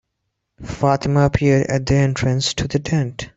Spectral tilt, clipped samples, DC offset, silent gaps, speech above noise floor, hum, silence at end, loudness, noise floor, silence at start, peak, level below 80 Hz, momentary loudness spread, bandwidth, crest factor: -6 dB/octave; under 0.1%; under 0.1%; none; 58 dB; none; 0.1 s; -18 LUFS; -75 dBFS; 0.6 s; -2 dBFS; -38 dBFS; 6 LU; 8 kHz; 16 dB